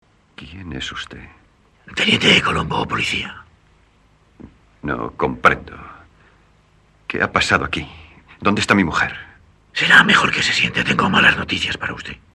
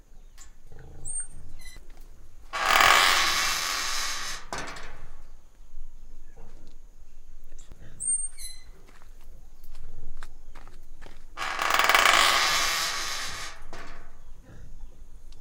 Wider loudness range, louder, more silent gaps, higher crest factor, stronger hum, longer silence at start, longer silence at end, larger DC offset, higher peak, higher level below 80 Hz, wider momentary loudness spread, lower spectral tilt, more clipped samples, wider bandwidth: second, 9 LU vs 13 LU; first, -16 LUFS vs -23 LUFS; neither; about the same, 20 dB vs 24 dB; neither; first, 0.4 s vs 0.1 s; first, 0.2 s vs 0 s; neither; first, 0 dBFS vs -4 dBFS; second, -46 dBFS vs -40 dBFS; second, 20 LU vs 28 LU; first, -3.5 dB/octave vs 0.5 dB/octave; neither; second, 13 kHz vs 17.5 kHz